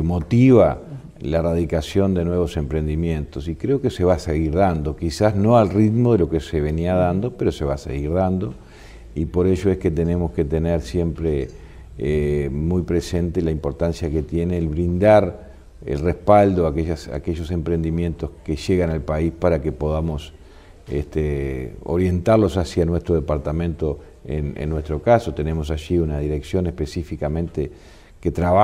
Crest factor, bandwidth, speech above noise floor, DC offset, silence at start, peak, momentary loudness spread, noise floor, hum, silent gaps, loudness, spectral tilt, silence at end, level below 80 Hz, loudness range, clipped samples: 20 dB; 13 kHz; 23 dB; under 0.1%; 0 s; 0 dBFS; 12 LU; -43 dBFS; none; none; -21 LUFS; -8 dB/octave; 0 s; -32 dBFS; 4 LU; under 0.1%